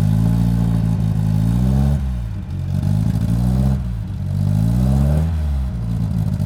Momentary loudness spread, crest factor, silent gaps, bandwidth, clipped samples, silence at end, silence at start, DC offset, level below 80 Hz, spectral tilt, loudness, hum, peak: 7 LU; 10 dB; none; 15 kHz; under 0.1%; 0 s; 0 s; under 0.1%; -24 dBFS; -9 dB/octave; -19 LUFS; none; -6 dBFS